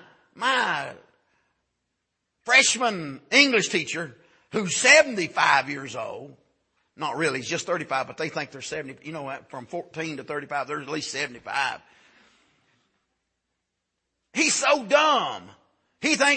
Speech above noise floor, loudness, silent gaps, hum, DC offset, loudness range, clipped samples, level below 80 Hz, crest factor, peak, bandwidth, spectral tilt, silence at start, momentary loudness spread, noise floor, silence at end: 56 dB; -23 LUFS; none; none; under 0.1%; 12 LU; under 0.1%; -72 dBFS; 24 dB; -2 dBFS; 8.8 kHz; -2 dB/octave; 0.35 s; 18 LU; -80 dBFS; 0 s